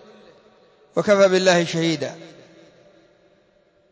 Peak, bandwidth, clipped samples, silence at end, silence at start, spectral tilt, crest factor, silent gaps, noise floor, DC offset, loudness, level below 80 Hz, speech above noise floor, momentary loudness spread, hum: -4 dBFS; 8 kHz; under 0.1%; 1.7 s; 0.95 s; -4.5 dB/octave; 18 dB; none; -60 dBFS; under 0.1%; -19 LUFS; -70 dBFS; 41 dB; 15 LU; none